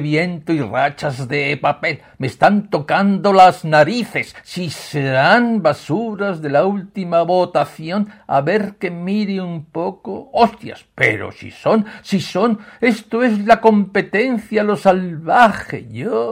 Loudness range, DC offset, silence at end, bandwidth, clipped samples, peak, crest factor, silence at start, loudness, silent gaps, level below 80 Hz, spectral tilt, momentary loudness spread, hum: 5 LU; under 0.1%; 0 s; 16 kHz; under 0.1%; 0 dBFS; 16 dB; 0 s; -17 LUFS; none; -54 dBFS; -6.5 dB/octave; 12 LU; none